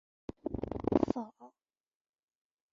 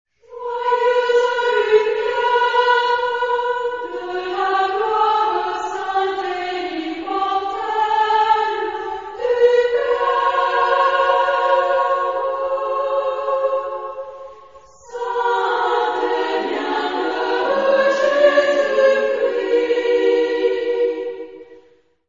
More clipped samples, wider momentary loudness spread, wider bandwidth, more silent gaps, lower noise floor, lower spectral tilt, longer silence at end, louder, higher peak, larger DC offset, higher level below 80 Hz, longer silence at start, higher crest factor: neither; first, 16 LU vs 9 LU; about the same, 7.4 kHz vs 7.6 kHz; neither; first, -74 dBFS vs -53 dBFS; first, -8.5 dB/octave vs -3 dB/octave; first, 1.25 s vs 0.5 s; second, -35 LUFS vs -18 LUFS; second, -10 dBFS vs -2 dBFS; second, under 0.1% vs 0.2%; about the same, -56 dBFS vs -60 dBFS; first, 0.45 s vs 0.3 s; first, 28 dB vs 16 dB